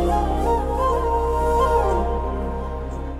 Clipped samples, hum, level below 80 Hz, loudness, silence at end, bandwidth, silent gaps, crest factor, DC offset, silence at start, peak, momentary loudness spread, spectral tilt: under 0.1%; none; -26 dBFS; -22 LUFS; 0 s; 13 kHz; none; 14 dB; under 0.1%; 0 s; -8 dBFS; 10 LU; -7 dB/octave